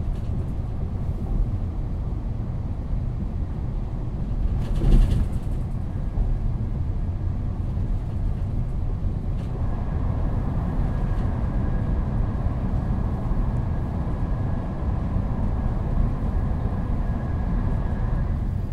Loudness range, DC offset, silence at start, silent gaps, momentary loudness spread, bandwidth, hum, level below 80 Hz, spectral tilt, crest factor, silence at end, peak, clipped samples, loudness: 3 LU; under 0.1%; 0 s; none; 4 LU; 4.8 kHz; none; -26 dBFS; -9.5 dB/octave; 18 dB; 0 s; -4 dBFS; under 0.1%; -27 LUFS